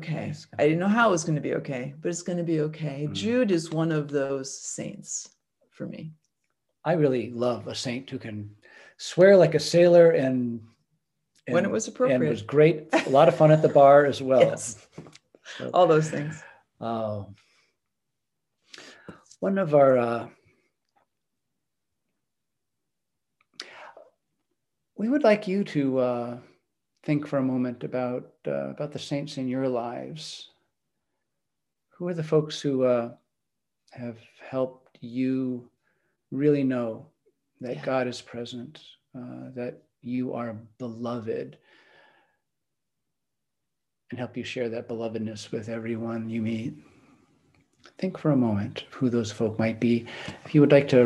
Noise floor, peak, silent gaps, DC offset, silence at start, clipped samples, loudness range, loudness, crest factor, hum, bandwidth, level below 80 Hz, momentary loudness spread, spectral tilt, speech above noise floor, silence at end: -86 dBFS; -4 dBFS; none; under 0.1%; 0 s; under 0.1%; 14 LU; -25 LUFS; 22 dB; none; 12 kHz; -72 dBFS; 20 LU; -6 dB/octave; 61 dB; 0 s